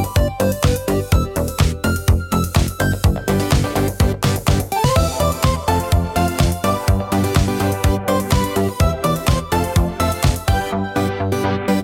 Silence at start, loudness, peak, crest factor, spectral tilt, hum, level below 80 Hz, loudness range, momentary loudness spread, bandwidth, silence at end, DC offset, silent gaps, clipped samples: 0 s; -18 LUFS; -2 dBFS; 14 dB; -5.5 dB/octave; none; -26 dBFS; 1 LU; 2 LU; 17 kHz; 0 s; under 0.1%; none; under 0.1%